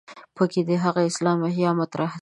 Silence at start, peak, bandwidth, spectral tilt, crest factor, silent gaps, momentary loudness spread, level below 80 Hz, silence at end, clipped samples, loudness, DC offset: 0.1 s; -6 dBFS; 11 kHz; -6.5 dB/octave; 16 dB; none; 3 LU; -70 dBFS; 0 s; under 0.1%; -23 LUFS; under 0.1%